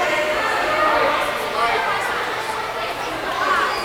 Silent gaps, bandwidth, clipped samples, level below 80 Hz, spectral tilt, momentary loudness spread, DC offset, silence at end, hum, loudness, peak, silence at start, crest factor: none; over 20 kHz; under 0.1%; -48 dBFS; -2.5 dB/octave; 7 LU; under 0.1%; 0 s; none; -20 LUFS; -6 dBFS; 0 s; 14 dB